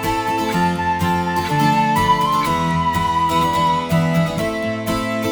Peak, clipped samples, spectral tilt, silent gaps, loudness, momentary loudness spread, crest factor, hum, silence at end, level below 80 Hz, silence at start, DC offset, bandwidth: -4 dBFS; under 0.1%; -5.5 dB/octave; none; -18 LUFS; 5 LU; 14 dB; none; 0 s; -40 dBFS; 0 s; under 0.1%; over 20 kHz